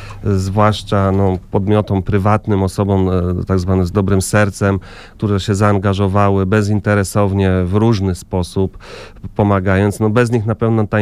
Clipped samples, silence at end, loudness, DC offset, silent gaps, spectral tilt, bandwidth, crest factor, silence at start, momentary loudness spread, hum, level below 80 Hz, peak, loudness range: under 0.1%; 0 s; -15 LUFS; under 0.1%; none; -7 dB/octave; 13.5 kHz; 14 dB; 0 s; 6 LU; none; -36 dBFS; 0 dBFS; 1 LU